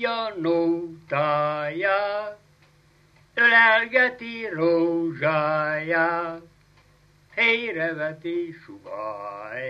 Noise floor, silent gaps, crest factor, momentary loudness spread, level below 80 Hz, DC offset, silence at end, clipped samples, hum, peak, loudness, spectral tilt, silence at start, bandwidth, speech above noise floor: -58 dBFS; none; 20 dB; 17 LU; -68 dBFS; under 0.1%; 0 s; under 0.1%; 50 Hz at -60 dBFS; -6 dBFS; -22 LUFS; -6.5 dB/octave; 0 s; 6.6 kHz; 33 dB